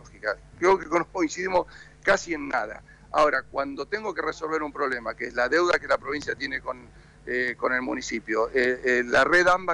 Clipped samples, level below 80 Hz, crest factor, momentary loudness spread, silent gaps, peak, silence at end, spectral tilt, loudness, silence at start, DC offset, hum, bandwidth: under 0.1%; -52 dBFS; 14 dB; 10 LU; none; -12 dBFS; 0 s; -3.5 dB/octave; -25 LUFS; 0.05 s; under 0.1%; none; 10.5 kHz